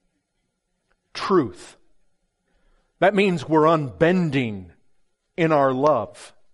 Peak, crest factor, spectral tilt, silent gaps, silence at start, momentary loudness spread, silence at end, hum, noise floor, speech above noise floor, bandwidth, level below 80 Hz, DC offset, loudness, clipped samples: -6 dBFS; 18 dB; -7 dB/octave; none; 1.15 s; 15 LU; 0.25 s; none; -75 dBFS; 55 dB; 11.5 kHz; -60 dBFS; under 0.1%; -21 LUFS; under 0.1%